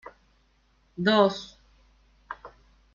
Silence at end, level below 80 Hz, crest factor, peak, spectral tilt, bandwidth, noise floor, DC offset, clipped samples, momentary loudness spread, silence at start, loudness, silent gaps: 0.5 s; -62 dBFS; 24 dB; -6 dBFS; -5.5 dB/octave; 7.4 kHz; -65 dBFS; under 0.1%; under 0.1%; 24 LU; 1 s; -24 LUFS; none